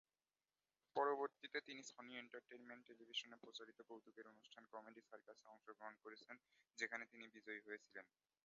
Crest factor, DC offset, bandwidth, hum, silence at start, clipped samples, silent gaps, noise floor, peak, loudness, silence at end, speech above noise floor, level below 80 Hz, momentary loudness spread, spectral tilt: 24 dB; under 0.1%; 7.2 kHz; none; 0.95 s; under 0.1%; none; under -90 dBFS; -28 dBFS; -52 LUFS; 0.4 s; over 37 dB; under -90 dBFS; 17 LU; 0.5 dB/octave